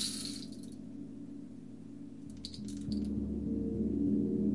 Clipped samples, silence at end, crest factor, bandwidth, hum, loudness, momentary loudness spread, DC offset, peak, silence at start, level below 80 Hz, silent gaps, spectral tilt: under 0.1%; 0 s; 16 dB; 11.5 kHz; none; -38 LUFS; 16 LU; 0.2%; -20 dBFS; 0 s; -52 dBFS; none; -5.5 dB/octave